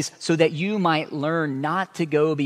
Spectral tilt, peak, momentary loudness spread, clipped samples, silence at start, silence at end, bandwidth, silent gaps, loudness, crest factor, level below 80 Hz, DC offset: -5.5 dB/octave; -4 dBFS; 4 LU; under 0.1%; 0 s; 0 s; 13.5 kHz; none; -23 LUFS; 20 dB; -72 dBFS; under 0.1%